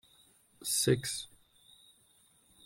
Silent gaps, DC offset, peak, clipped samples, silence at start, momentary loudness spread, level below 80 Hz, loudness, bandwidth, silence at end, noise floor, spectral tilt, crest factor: none; under 0.1%; -16 dBFS; under 0.1%; 0.6 s; 14 LU; -68 dBFS; -32 LUFS; 16.5 kHz; 1.4 s; -67 dBFS; -3.5 dB/octave; 22 dB